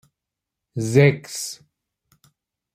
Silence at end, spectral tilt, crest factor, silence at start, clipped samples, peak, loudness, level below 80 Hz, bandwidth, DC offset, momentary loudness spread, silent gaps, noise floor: 1.2 s; -6 dB/octave; 22 dB; 0.75 s; under 0.1%; -2 dBFS; -20 LUFS; -60 dBFS; 15.5 kHz; under 0.1%; 18 LU; none; -85 dBFS